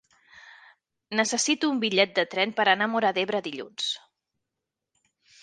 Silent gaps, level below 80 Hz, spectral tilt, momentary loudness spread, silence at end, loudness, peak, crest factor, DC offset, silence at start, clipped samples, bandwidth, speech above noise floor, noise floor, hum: none; -78 dBFS; -2 dB/octave; 8 LU; 1.45 s; -25 LUFS; -6 dBFS; 22 dB; under 0.1%; 0.35 s; under 0.1%; 10 kHz; 60 dB; -86 dBFS; none